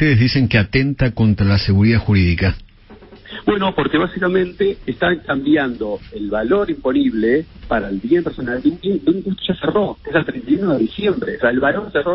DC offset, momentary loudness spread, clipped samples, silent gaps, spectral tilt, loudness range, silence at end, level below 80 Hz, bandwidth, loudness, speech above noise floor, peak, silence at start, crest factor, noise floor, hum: under 0.1%; 7 LU; under 0.1%; none; -10.5 dB/octave; 2 LU; 0 s; -36 dBFS; 5.8 kHz; -17 LUFS; 25 dB; -2 dBFS; 0 s; 16 dB; -42 dBFS; none